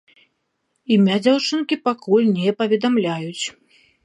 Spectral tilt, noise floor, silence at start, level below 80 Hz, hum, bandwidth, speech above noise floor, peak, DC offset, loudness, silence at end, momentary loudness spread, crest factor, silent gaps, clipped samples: -5.5 dB/octave; -72 dBFS; 0.9 s; -70 dBFS; none; 10.5 kHz; 53 dB; -4 dBFS; under 0.1%; -19 LUFS; 0.55 s; 11 LU; 16 dB; none; under 0.1%